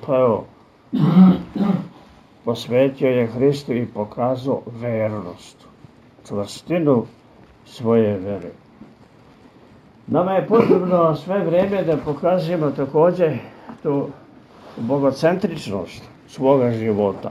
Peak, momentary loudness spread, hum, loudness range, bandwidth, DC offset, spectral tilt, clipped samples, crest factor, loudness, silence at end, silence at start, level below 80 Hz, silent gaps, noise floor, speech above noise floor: 0 dBFS; 15 LU; none; 6 LU; 12 kHz; under 0.1%; -8 dB/octave; under 0.1%; 20 dB; -19 LUFS; 0 s; 0 s; -56 dBFS; none; -48 dBFS; 30 dB